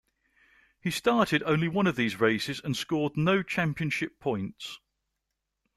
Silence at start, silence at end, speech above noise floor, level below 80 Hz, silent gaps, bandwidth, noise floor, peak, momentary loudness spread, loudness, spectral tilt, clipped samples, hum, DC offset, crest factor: 0.85 s; 1 s; 56 dB; -62 dBFS; none; 14.5 kHz; -83 dBFS; -10 dBFS; 11 LU; -28 LUFS; -5.5 dB/octave; under 0.1%; none; under 0.1%; 20 dB